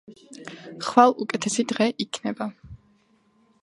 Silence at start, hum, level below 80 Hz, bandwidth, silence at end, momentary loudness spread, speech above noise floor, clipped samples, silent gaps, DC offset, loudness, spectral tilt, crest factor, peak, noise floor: 0.1 s; none; -60 dBFS; 11.5 kHz; 0.85 s; 22 LU; 40 dB; under 0.1%; none; under 0.1%; -23 LUFS; -4 dB/octave; 24 dB; 0 dBFS; -63 dBFS